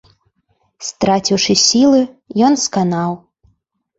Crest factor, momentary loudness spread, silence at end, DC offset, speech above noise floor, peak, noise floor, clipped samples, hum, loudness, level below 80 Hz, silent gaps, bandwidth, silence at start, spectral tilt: 16 dB; 15 LU; 0.8 s; under 0.1%; 49 dB; 0 dBFS; -63 dBFS; under 0.1%; none; -14 LUFS; -54 dBFS; none; 8.2 kHz; 0.8 s; -4 dB/octave